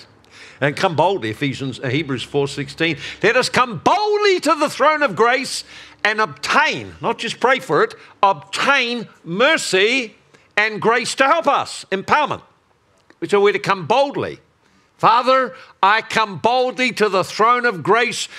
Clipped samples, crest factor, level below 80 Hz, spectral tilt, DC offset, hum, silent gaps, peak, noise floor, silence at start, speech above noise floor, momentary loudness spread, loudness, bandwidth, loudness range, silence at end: under 0.1%; 18 dB; -60 dBFS; -3.5 dB/octave; under 0.1%; none; none; 0 dBFS; -58 dBFS; 0 s; 40 dB; 9 LU; -17 LUFS; 14.5 kHz; 3 LU; 0 s